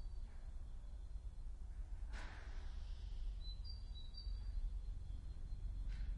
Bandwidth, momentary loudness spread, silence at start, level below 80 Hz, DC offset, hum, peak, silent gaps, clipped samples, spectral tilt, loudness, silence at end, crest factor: 10 kHz; 6 LU; 0 s; -46 dBFS; under 0.1%; none; -34 dBFS; none; under 0.1%; -5.5 dB/octave; -52 LUFS; 0 s; 12 dB